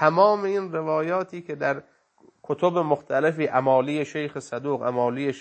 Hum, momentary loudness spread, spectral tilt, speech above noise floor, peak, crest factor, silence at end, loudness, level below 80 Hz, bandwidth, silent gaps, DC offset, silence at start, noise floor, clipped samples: none; 11 LU; -6.5 dB/octave; 32 dB; -4 dBFS; 20 dB; 0 s; -24 LUFS; -76 dBFS; 8.8 kHz; none; under 0.1%; 0 s; -55 dBFS; under 0.1%